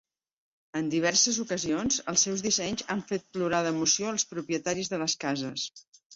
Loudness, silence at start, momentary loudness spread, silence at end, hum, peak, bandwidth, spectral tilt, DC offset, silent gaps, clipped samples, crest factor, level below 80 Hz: -28 LUFS; 0.75 s; 10 LU; 0 s; none; -10 dBFS; 8 kHz; -2.5 dB/octave; under 0.1%; 5.88-5.92 s, 6.05-6.10 s; under 0.1%; 20 dB; -64 dBFS